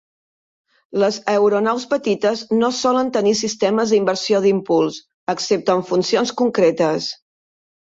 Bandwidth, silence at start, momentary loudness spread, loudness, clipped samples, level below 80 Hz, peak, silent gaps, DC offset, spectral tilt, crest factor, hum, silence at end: 8 kHz; 0.95 s; 7 LU; -18 LUFS; under 0.1%; -64 dBFS; -4 dBFS; 5.14-5.27 s; under 0.1%; -4.5 dB/octave; 14 dB; none; 0.75 s